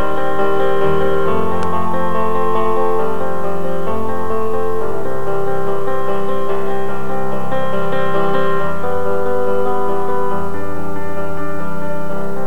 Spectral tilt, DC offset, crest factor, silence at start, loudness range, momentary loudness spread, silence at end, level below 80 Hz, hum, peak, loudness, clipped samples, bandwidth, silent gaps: -7 dB/octave; 30%; 14 dB; 0 s; 3 LU; 7 LU; 0 s; -42 dBFS; none; -2 dBFS; -20 LUFS; under 0.1%; 19 kHz; none